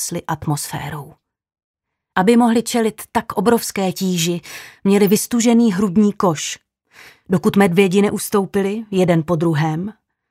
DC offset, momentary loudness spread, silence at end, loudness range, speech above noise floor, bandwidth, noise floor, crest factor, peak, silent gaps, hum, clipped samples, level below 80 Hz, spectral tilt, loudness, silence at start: under 0.1%; 12 LU; 0.4 s; 2 LU; 29 dB; 16 kHz; -46 dBFS; 18 dB; 0 dBFS; 1.64-1.74 s; none; under 0.1%; -54 dBFS; -5.5 dB/octave; -17 LUFS; 0 s